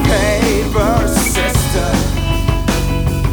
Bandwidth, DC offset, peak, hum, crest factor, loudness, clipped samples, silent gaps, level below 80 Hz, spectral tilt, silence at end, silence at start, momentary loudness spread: over 20 kHz; under 0.1%; 0 dBFS; none; 14 dB; -15 LUFS; under 0.1%; none; -20 dBFS; -5 dB/octave; 0 s; 0 s; 3 LU